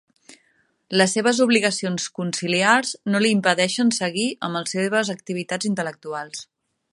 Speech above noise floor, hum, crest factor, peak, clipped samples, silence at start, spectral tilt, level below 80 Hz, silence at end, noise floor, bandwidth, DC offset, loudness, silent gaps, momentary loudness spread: 43 dB; none; 20 dB; -2 dBFS; under 0.1%; 0.3 s; -3.5 dB/octave; -72 dBFS; 0.5 s; -65 dBFS; 11.5 kHz; under 0.1%; -21 LUFS; none; 11 LU